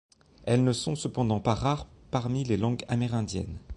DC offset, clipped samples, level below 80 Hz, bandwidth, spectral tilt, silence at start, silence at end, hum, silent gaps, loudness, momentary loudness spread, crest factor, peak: under 0.1%; under 0.1%; -48 dBFS; 11.5 kHz; -6.5 dB/octave; 0.4 s; 0 s; none; none; -29 LUFS; 8 LU; 18 dB; -10 dBFS